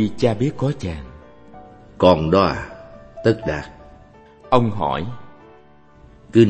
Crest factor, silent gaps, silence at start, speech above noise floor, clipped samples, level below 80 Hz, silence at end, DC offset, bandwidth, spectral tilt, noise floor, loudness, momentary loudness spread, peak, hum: 20 dB; none; 0 s; 30 dB; under 0.1%; -42 dBFS; 0 s; under 0.1%; 8.6 kHz; -7.5 dB/octave; -49 dBFS; -20 LUFS; 23 LU; 0 dBFS; none